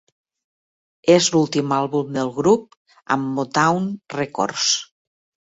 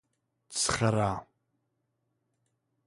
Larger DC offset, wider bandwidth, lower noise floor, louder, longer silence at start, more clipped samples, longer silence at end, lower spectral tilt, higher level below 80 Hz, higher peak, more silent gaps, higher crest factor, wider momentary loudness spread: neither; second, 8 kHz vs 11.5 kHz; first, under -90 dBFS vs -79 dBFS; first, -20 LUFS vs -29 LUFS; first, 1.05 s vs 0.5 s; neither; second, 0.6 s vs 1.65 s; about the same, -4 dB/octave vs -4 dB/octave; second, -62 dBFS vs -56 dBFS; first, -2 dBFS vs -12 dBFS; first, 2.77-2.85 s vs none; about the same, 18 dB vs 22 dB; about the same, 9 LU vs 11 LU